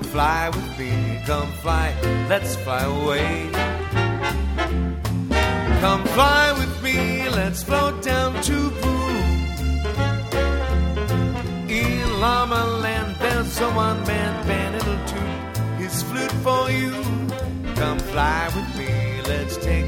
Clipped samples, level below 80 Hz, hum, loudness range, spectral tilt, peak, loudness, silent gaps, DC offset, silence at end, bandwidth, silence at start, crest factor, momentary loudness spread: under 0.1%; -28 dBFS; none; 4 LU; -5 dB/octave; -2 dBFS; -22 LUFS; none; under 0.1%; 0 s; 17.5 kHz; 0 s; 20 dB; 6 LU